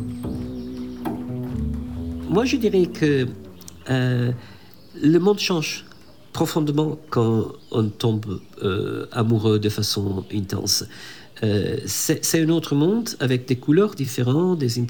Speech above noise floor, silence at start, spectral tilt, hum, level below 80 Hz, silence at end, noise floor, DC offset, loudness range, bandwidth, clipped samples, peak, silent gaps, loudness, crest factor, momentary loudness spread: 22 dB; 0 s; -5.5 dB/octave; none; -46 dBFS; 0 s; -43 dBFS; 0.4%; 3 LU; 19 kHz; under 0.1%; -6 dBFS; none; -22 LUFS; 16 dB; 12 LU